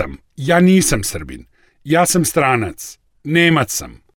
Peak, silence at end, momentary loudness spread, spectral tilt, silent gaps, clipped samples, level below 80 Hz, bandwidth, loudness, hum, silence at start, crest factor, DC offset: -2 dBFS; 0.25 s; 19 LU; -4.5 dB/octave; none; under 0.1%; -38 dBFS; 18.5 kHz; -15 LUFS; none; 0 s; 14 dB; under 0.1%